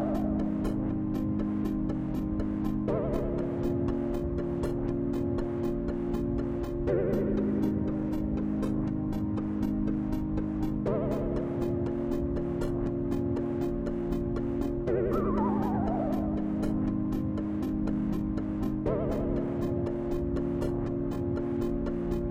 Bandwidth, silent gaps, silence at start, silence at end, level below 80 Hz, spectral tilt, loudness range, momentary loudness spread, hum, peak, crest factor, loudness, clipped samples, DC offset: 16 kHz; none; 0 s; 0 s; -40 dBFS; -9.5 dB/octave; 1 LU; 3 LU; none; -16 dBFS; 14 dB; -31 LUFS; under 0.1%; under 0.1%